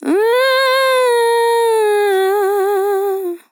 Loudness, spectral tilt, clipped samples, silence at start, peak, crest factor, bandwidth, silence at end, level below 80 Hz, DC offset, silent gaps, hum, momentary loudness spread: -14 LUFS; -0.5 dB/octave; under 0.1%; 0 s; -4 dBFS; 10 dB; 19 kHz; 0.15 s; under -90 dBFS; under 0.1%; none; none; 4 LU